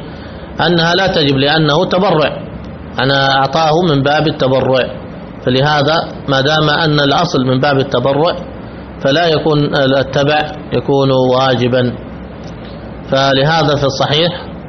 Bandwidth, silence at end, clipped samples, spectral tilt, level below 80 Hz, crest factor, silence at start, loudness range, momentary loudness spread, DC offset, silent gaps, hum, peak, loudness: 6.4 kHz; 0 s; under 0.1%; -6 dB/octave; -38 dBFS; 12 dB; 0 s; 2 LU; 17 LU; under 0.1%; none; none; 0 dBFS; -12 LUFS